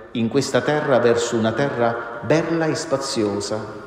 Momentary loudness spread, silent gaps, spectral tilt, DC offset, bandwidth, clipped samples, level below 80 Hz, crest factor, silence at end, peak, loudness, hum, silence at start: 6 LU; none; -5 dB/octave; under 0.1%; 16 kHz; under 0.1%; -56 dBFS; 16 dB; 0 s; -4 dBFS; -20 LUFS; none; 0 s